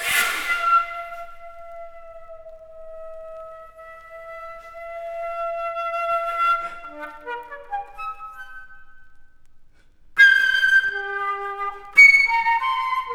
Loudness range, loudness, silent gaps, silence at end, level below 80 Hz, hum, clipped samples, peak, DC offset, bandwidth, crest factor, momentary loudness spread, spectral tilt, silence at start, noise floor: 23 LU; -18 LUFS; none; 0 s; -52 dBFS; none; under 0.1%; -2 dBFS; under 0.1%; over 20 kHz; 20 dB; 27 LU; 0.5 dB/octave; 0 s; -49 dBFS